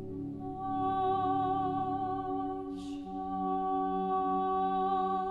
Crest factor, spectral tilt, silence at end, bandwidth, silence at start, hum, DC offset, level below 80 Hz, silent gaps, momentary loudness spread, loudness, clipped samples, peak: 12 dB; -8 dB/octave; 0 s; 7.6 kHz; 0 s; none; under 0.1%; -58 dBFS; none; 9 LU; -33 LUFS; under 0.1%; -20 dBFS